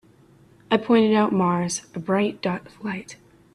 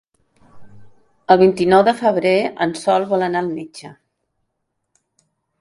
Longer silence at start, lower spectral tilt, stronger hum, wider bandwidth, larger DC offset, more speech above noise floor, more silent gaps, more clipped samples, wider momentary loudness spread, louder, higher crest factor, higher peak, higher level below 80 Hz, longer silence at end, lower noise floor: first, 0.7 s vs 0.55 s; about the same, -5.5 dB/octave vs -6 dB/octave; neither; about the same, 11.5 kHz vs 11.5 kHz; neither; second, 32 dB vs 58 dB; neither; neither; second, 14 LU vs 18 LU; second, -22 LUFS vs -16 LUFS; about the same, 18 dB vs 18 dB; second, -6 dBFS vs 0 dBFS; second, -64 dBFS vs -58 dBFS; second, 0.4 s vs 1.7 s; second, -54 dBFS vs -74 dBFS